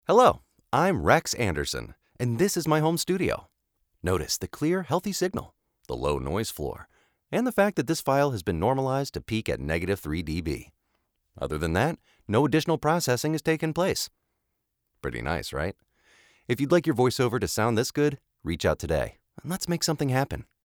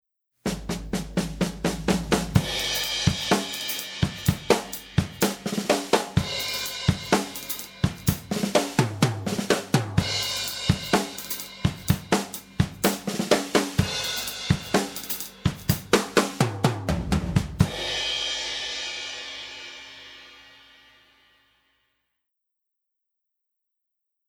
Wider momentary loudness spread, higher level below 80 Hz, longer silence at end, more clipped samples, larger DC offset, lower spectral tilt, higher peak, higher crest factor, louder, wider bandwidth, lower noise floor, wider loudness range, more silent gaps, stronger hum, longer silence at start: first, 12 LU vs 8 LU; second, -48 dBFS vs -42 dBFS; second, 0.25 s vs 3.8 s; neither; neither; about the same, -5 dB/octave vs -4.5 dB/octave; about the same, -4 dBFS vs -2 dBFS; about the same, 22 dB vs 24 dB; about the same, -27 LUFS vs -26 LUFS; about the same, over 20 kHz vs over 20 kHz; second, -78 dBFS vs -82 dBFS; about the same, 4 LU vs 4 LU; neither; neither; second, 0.1 s vs 0.45 s